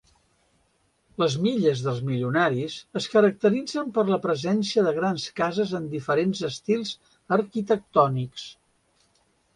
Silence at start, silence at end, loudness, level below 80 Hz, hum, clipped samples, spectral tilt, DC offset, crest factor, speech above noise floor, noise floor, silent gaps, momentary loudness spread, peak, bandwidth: 1.2 s; 1.05 s; -25 LUFS; -66 dBFS; none; under 0.1%; -6 dB/octave; under 0.1%; 20 dB; 44 dB; -68 dBFS; none; 10 LU; -6 dBFS; 11 kHz